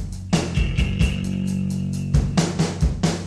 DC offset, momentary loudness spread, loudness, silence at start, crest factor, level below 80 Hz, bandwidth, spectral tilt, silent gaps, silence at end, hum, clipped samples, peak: under 0.1%; 4 LU; -23 LUFS; 0 s; 16 dB; -28 dBFS; 12.5 kHz; -6 dB/octave; none; 0 s; none; under 0.1%; -6 dBFS